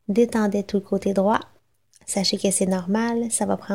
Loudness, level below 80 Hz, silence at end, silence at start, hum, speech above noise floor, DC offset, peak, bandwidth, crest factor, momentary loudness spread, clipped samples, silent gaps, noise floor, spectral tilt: -22 LUFS; -58 dBFS; 0 s; 0.1 s; none; 38 dB; 0.2%; -4 dBFS; 16 kHz; 18 dB; 5 LU; under 0.1%; none; -60 dBFS; -4.5 dB/octave